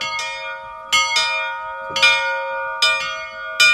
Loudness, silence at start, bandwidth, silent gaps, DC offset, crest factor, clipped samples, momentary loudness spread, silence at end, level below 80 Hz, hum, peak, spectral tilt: -18 LUFS; 0 s; 16 kHz; none; under 0.1%; 20 dB; under 0.1%; 14 LU; 0 s; -56 dBFS; none; 0 dBFS; 1.5 dB/octave